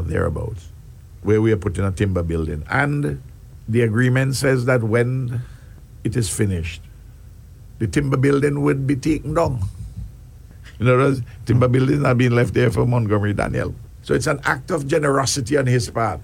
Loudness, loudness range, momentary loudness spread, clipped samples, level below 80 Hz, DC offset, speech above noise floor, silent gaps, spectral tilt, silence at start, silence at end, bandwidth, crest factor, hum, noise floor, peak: -20 LUFS; 4 LU; 12 LU; under 0.1%; -38 dBFS; under 0.1%; 22 dB; none; -6.5 dB/octave; 0 s; 0 s; 15.5 kHz; 18 dB; none; -41 dBFS; -2 dBFS